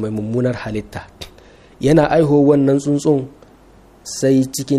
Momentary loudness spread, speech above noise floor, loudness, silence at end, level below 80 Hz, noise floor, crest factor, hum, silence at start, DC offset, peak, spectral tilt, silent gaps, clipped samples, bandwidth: 22 LU; 31 dB; -16 LUFS; 0 s; -44 dBFS; -46 dBFS; 16 dB; none; 0 s; under 0.1%; 0 dBFS; -6.5 dB/octave; none; under 0.1%; 14.5 kHz